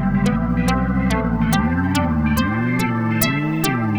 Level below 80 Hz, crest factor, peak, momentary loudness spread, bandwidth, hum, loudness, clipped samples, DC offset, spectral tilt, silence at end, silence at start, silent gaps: -30 dBFS; 18 dB; 0 dBFS; 1 LU; over 20 kHz; none; -19 LUFS; under 0.1%; under 0.1%; -6 dB/octave; 0 s; 0 s; none